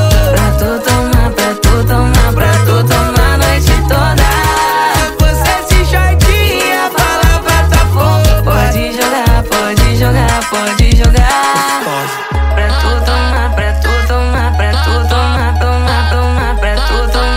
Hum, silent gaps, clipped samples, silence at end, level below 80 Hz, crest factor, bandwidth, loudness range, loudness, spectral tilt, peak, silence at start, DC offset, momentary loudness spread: none; none; under 0.1%; 0 s; -12 dBFS; 10 dB; 16.5 kHz; 2 LU; -11 LUFS; -5 dB/octave; 0 dBFS; 0 s; under 0.1%; 4 LU